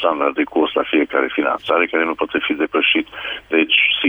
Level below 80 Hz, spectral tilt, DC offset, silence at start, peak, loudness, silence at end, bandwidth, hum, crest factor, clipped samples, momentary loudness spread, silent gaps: -56 dBFS; -5 dB/octave; under 0.1%; 0 s; -2 dBFS; -17 LUFS; 0 s; 4 kHz; none; 16 dB; under 0.1%; 6 LU; none